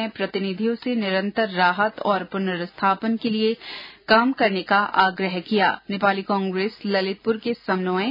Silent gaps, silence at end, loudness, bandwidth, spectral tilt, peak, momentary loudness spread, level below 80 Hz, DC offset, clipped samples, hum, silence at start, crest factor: none; 0 s; -22 LUFS; 5.4 kHz; -8 dB/octave; -4 dBFS; 7 LU; -64 dBFS; under 0.1%; under 0.1%; none; 0 s; 18 dB